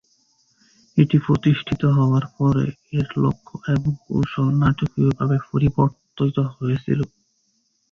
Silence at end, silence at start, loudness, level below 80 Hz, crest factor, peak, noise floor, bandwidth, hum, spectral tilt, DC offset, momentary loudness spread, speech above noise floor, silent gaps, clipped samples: 0.85 s; 0.95 s; -21 LUFS; -46 dBFS; 18 dB; -2 dBFS; -67 dBFS; 6.8 kHz; none; -9 dB/octave; under 0.1%; 7 LU; 48 dB; none; under 0.1%